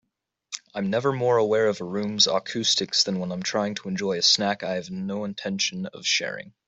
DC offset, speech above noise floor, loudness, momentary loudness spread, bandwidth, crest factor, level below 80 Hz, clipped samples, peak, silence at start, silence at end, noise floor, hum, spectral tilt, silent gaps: under 0.1%; 32 dB; -24 LUFS; 10 LU; 8.4 kHz; 20 dB; -68 dBFS; under 0.1%; -6 dBFS; 0.5 s; 0.2 s; -57 dBFS; none; -3 dB/octave; none